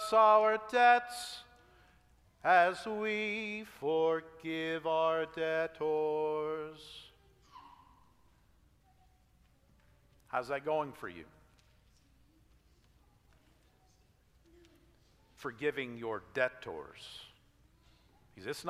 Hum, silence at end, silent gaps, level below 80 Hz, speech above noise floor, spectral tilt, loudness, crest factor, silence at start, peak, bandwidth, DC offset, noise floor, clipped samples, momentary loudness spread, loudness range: none; 0 s; none; -70 dBFS; 35 dB; -4 dB/octave; -32 LUFS; 22 dB; 0 s; -14 dBFS; 15 kHz; under 0.1%; -68 dBFS; under 0.1%; 21 LU; 14 LU